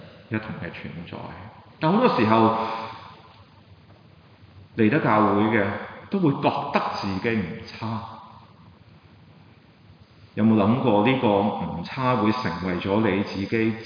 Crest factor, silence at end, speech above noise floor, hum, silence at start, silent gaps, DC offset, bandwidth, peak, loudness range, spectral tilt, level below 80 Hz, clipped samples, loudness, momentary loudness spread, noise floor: 22 dB; 0 s; 29 dB; none; 0 s; none; under 0.1%; 5.2 kHz; -2 dBFS; 7 LU; -8 dB/octave; -58 dBFS; under 0.1%; -23 LUFS; 17 LU; -52 dBFS